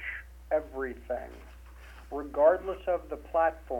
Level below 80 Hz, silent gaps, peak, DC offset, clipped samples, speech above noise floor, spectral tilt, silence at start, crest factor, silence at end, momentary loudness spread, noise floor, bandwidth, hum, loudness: -48 dBFS; none; -10 dBFS; under 0.1%; under 0.1%; 19 dB; -7 dB/octave; 0 s; 20 dB; 0 s; 25 LU; -48 dBFS; 16.5 kHz; none; -30 LUFS